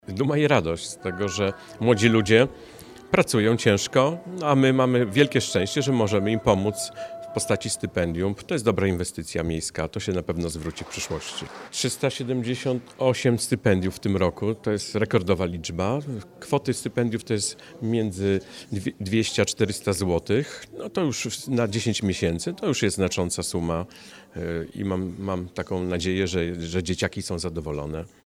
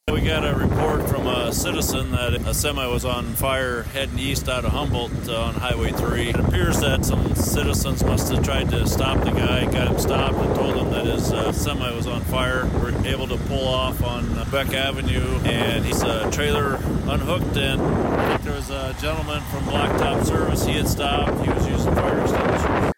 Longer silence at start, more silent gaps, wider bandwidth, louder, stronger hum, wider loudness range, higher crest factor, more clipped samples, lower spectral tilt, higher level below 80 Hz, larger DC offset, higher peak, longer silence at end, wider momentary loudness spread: about the same, 0.1 s vs 0.05 s; neither; about the same, 16 kHz vs 16.5 kHz; second, -25 LUFS vs -22 LUFS; neither; first, 7 LU vs 2 LU; first, 20 dB vs 10 dB; neither; about the same, -5 dB/octave vs -5 dB/octave; second, -48 dBFS vs -28 dBFS; neither; first, -4 dBFS vs -10 dBFS; first, 0.2 s vs 0.05 s; first, 11 LU vs 4 LU